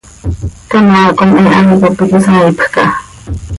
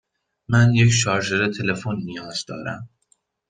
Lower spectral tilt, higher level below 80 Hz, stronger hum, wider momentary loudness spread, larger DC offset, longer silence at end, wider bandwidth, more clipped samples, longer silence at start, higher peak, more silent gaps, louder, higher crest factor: first, -7 dB/octave vs -5 dB/octave; first, -28 dBFS vs -54 dBFS; neither; about the same, 15 LU vs 15 LU; neither; second, 0 s vs 0.65 s; first, 11.5 kHz vs 9.4 kHz; neither; second, 0.25 s vs 0.5 s; first, 0 dBFS vs -4 dBFS; neither; first, -8 LUFS vs -21 LUFS; second, 8 dB vs 18 dB